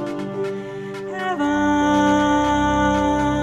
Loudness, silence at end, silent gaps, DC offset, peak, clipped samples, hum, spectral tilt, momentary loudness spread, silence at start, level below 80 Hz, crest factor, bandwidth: -20 LUFS; 0 s; none; under 0.1%; -8 dBFS; under 0.1%; none; -5.5 dB/octave; 12 LU; 0 s; -38 dBFS; 12 dB; 10.5 kHz